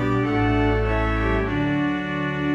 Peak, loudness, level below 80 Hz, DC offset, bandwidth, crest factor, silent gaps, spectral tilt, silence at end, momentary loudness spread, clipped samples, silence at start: -8 dBFS; -22 LUFS; -30 dBFS; under 0.1%; 7.4 kHz; 12 dB; none; -8 dB/octave; 0 s; 4 LU; under 0.1%; 0 s